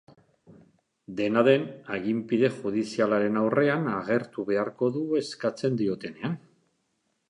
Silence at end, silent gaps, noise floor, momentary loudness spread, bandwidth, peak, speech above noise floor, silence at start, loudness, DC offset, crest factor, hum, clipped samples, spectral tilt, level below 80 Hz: 0.95 s; none; -75 dBFS; 10 LU; 11 kHz; -6 dBFS; 49 dB; 1.1 s; -27 LUFS; under 0.1%; 20 dB; none; under 0.1%; -7 dB/octave; -70 dBFS